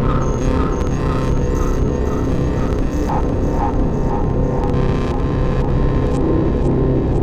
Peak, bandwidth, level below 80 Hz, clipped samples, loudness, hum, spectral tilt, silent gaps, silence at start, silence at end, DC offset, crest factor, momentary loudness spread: -4 dBFS; 8.8 kHz; -20 dBFS; under 0.1%; -19 LUFS; none; -8 dB/octave; none; 0 s; 0 s; under 0.1%; 12 dB; 2 LU